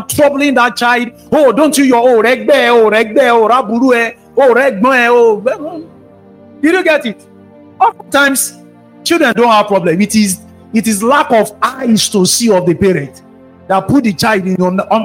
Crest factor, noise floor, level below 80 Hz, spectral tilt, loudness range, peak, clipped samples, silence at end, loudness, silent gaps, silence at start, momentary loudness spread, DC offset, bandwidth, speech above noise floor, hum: 10 dB; -39 dBFS; -48 dBFS; -4 dB/octave; 4 LU; 0 dBFS; under 0.1%; 0 s; -10 LUFS; none; 0 s; 7 LU; under 0.1%; 16.5 kHz; 29 dB; none